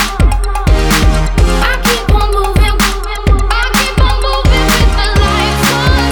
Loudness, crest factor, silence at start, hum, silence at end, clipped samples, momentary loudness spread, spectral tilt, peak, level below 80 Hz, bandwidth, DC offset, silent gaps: -11 LUFS; 10 dB; 0 s; none; 0 s; under 0.1%; 3 LU; -4.5 dB/octave; 0 dBFS; -12 dBFS; over 20 kHz; under 0.1%; none